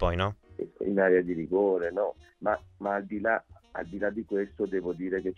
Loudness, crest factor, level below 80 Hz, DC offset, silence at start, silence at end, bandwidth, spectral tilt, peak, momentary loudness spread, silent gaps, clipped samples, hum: -29 LUFS; 18 dB; -48 dBFS; under 0.1%; 0 s; 0.05 s; 6.8 kHz; -8 dB/octave; -12 dBFS; 10 LU; none; under 0.1%; none